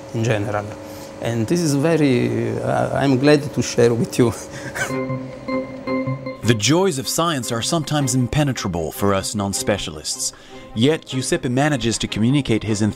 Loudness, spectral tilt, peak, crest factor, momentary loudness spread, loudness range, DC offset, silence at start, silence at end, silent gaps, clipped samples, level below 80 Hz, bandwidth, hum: -20 LUFS; -5 dB/octave; -2 dBFS; 18 dB; 10 LU; 3 LU; under 0.1%; 0 s; 0 s; none; under 0.1%; -46 dBFS; 16 kHz; none